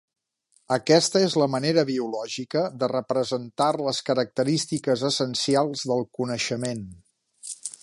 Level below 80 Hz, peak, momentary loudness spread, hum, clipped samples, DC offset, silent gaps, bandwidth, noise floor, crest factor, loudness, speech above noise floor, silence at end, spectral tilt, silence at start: -66 dBFS; -4 dBFS; 11 LU; none; under 0.1%; under 0.1%; none; 11.5 kHz; -67 dBFS; 20 dB; -24 LUFS; 43 dB; 0.1 s; -4.5 dB/octave; 0.7 s